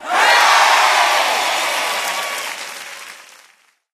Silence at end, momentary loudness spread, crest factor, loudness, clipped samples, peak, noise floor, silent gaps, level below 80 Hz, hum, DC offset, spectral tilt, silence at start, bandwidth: 0.75 s; 20 LU; 16 dB; -14 LUFS; under 0.1%; 0 dBFS; -54 dBFS; none; -70 dBFS; none; under 0.1%; 2 dB/octave; 0 s; 15.5 kHz